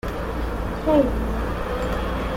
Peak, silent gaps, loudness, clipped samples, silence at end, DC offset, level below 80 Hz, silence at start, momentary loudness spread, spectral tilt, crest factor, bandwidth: -6 dBFS; none; -24 LUFS; under 0.1%; 0 s; under 0.1%; -28 dBFS; 0.05 s; 8 LU; -7 dB/octave; 16 dB; 16.5 kHz